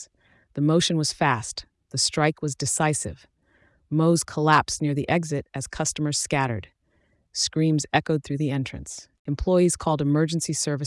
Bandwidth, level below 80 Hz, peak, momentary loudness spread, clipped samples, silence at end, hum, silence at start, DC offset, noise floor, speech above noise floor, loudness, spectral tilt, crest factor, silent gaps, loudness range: 12 kHz; -48 dBFS; -6 dBFS; 13 LU; under 0.1%; 0 s; none; 0 s; under 0.1%; -66 dBFS; 43 dB; -24 LUFS; -4.5 dB/octave; 18 dB; 9.19-9.25 s; 2 LU